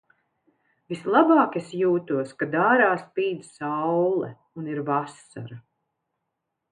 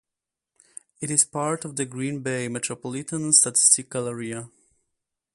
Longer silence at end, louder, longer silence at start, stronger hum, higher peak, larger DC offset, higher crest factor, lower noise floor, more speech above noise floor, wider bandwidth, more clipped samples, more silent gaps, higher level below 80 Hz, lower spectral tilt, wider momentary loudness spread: first, 1.1 s vs 0.9 s; about the same, -23 LUFS vs -22 LUFS; about the same, 0.9 s vs 1 s; neither; about the same, -4 dBFS vs -2 dBFS; neither; about the same, 20 dB vs 24 dB; second, -81 dBFS vs -87 dBFS; second, 58 dB vs 63 dB; second, 10 kHz vs 12 kHz; neither; neither; second, -74 dBFS vs -68 dBFS; first, -7 dB/octave vs -2.5 dB/octave; about the same, 18 LU vs 16 LU